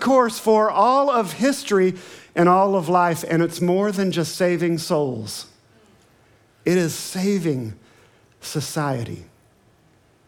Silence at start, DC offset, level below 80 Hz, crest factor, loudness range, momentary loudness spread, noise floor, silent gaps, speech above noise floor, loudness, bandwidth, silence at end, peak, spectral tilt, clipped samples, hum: 0 s; under 0.1%; -66 dBFS; 18 dB; 8 LU; 14 LU; -57 dBFS; none; 37 dB; -20 LUFS; 18.5 kHz; 1.05 s; -4 dBFS; -5.5 dB/octave; under 0.1%; none